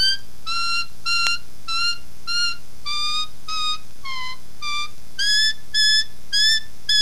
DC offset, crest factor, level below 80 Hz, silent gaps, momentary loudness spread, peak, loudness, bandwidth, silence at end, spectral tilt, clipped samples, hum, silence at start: 8%; 24 dB; -52 dBFS; none; 14 LU; 0 dBFS; -21 LUFS; 15.5 kHz; 0 s; 1 dB/octave; under 0.1%; none; 0 s